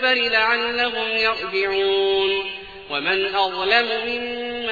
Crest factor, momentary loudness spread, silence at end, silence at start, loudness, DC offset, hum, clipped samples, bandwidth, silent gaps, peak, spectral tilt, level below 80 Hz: 20 dB; 9 LU; 0 s; 0 s; -20 LUFS; 0.2%; none; under 0.1%; 4.9 kHz; none; -2 dBFS; -4 dB/octave; -54 dBFS